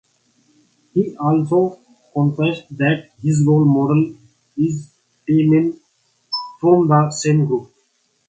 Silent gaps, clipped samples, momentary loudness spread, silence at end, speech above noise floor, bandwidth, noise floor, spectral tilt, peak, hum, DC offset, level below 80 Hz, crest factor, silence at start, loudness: none; under 0.1%; 11 LU; 0.65 s; 48 dB; 9 kHz; -64 dBFS; -7 dB/octave; 0 dBFS; 60 Hz at -45 dBFS; under 0.1%; -58 dBFS; 18 dB; 0.95 s; -18 LUFS